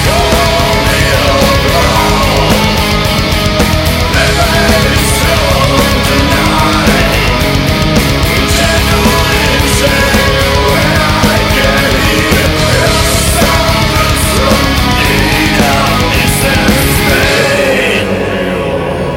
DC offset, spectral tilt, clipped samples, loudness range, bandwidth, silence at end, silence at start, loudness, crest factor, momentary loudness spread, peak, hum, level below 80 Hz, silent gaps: under 0.1%; -4 dB/octave; under 0.1%; 1 LU; 16.5 kHz; 0 s; 0 s; -9 LUFS; 8 dB; 2 LU; 0 dBFS; none; -18 dBFS; none